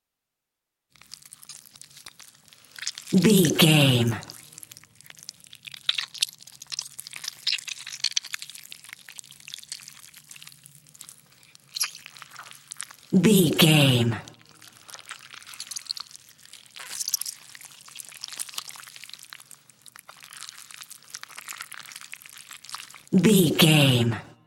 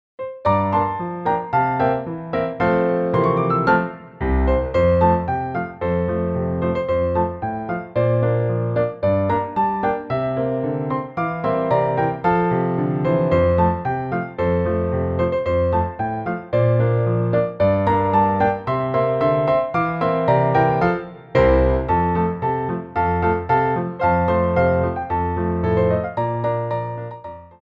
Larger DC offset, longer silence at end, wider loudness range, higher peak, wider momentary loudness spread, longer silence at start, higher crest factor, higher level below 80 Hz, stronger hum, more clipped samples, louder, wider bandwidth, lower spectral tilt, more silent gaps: neither; about the same, 0.25 s vs 0.15 s; first, 17 LU vs 3 LU; about the same, -4 dBFS vs -4 dBFS; first, 27 LU vs 7 LU; first, 1.5 s vs 0.2 s; first, 24 dB vs 16 dB; second, -66 dBFS vs -34 dBFS; neither; neither; second, -23 LUFS vs -20 LUFS; first, 17 kHz vs 5.4 kHz; second, -4.5 dB/octave vs -10 dB/octave; neither